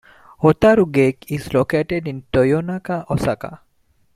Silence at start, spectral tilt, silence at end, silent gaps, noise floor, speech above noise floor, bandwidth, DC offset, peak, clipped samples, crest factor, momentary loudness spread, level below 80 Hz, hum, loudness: 0.4 s; -7.5 dB/octave; 0.6 s; none; -60 dBFS; 42 dB; 15.5 kHz; under 0.1%; -2 dBFS; under 0.1%; 18 dB; 11 LU; -44 dBFS; none; -18 LUFS